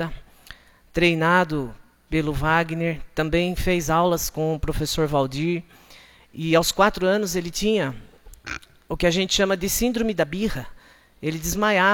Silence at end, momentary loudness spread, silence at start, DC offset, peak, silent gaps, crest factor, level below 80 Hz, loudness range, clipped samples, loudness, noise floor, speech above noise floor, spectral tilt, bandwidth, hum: 0 s; 15 LU; 0 s; under 0.1%; -4 dBFS; none; 20 dB; -38 dBFS; 2 LU; under 0.1%; -22 LUFS; -50 dBFS; 28 dB; -4.5 dB/octave; 17.5 kHz; none